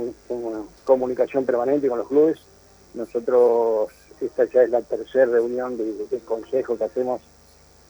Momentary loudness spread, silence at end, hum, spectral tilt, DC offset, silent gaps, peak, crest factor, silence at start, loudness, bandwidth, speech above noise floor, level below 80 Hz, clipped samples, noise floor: 12 LU; 0.7 s; 50 Hz at -60 dBFS; -6.5 dB/octave; under 0.1%; none; -6 dBFS; 18 dB; 0 s; -22 LUFS; over 20 kHz; 31 dB; -60 dBFS; under 0.1%; -52 dBFS